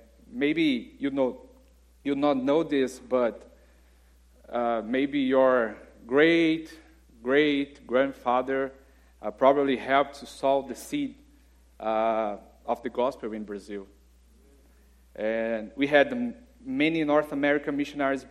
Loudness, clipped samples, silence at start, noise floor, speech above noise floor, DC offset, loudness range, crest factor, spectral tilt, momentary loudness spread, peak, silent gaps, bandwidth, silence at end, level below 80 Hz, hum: -26 LUFS; under 0.1%; 0.3 s; -58 dBFS; 32 dB; under 0.1%; 7 LU; 22 dB; -5.5 dB/octave; 14 LU; -6 dBFS; none; 14 kHz; 0.05 s; -58 dBFS; none